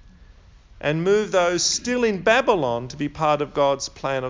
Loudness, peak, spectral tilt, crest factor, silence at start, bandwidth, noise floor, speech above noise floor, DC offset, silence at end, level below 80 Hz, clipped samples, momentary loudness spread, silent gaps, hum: -21 LUFS; -4 dBFS; -3.5 dB/octave; 18 dB; 0.75 s; 7.8 kHz; -48 dBFS; 27 dB; under 0.1%; 0 s; -50 dBFS; under 0.1%; 8 LU; none; none